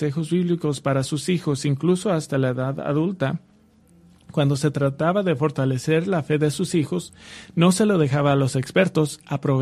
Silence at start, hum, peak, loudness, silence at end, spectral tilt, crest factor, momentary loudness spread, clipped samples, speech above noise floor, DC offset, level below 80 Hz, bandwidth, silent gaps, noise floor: 0 s; none; -4 dBFS; -22 LUFS; 0 s; -6.5 dB/octave; 18 dB; 7 LU; under 0.1%; 33 dB; under 0.1%; -58 dBFS; 14 kHz; none; -55 dBFS